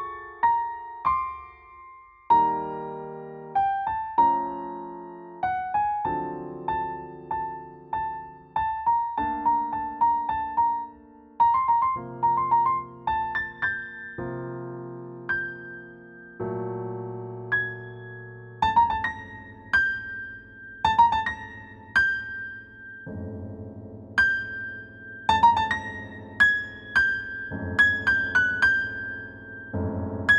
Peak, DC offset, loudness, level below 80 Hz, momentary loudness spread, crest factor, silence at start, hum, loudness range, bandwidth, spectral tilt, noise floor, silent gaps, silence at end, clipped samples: -8 dBFS; under 0.1%; -25 LUFS; -52 dBFS; 19 LU; 20 dB; 0 s; none; 8 LU; 9.4 kHz; -5 dB/octave; -49 dBFS; none; 0 s; under 0.1%